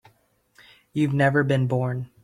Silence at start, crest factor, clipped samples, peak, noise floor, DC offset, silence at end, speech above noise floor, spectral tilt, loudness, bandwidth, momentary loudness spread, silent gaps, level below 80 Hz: 0.95 s; 18 dB; under 0.1%; -6 dBFS; -64 dBFS; under 0.1%; 0.2 s; 42 dB; -8 dB/octave; -23 LUFS; 10.5 kHz; 8 LU; none; -60 dBFS